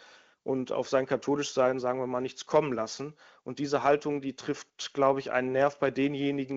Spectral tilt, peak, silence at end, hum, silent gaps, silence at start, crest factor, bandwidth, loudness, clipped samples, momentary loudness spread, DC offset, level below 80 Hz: -5 dB/octave; -10 dBFS; 0 s; none; none; 0.45 s; 20 dB; 8 kHz; -29 LUFS; under 0.1%; 10 LU; under 0.1%; -68 dBFS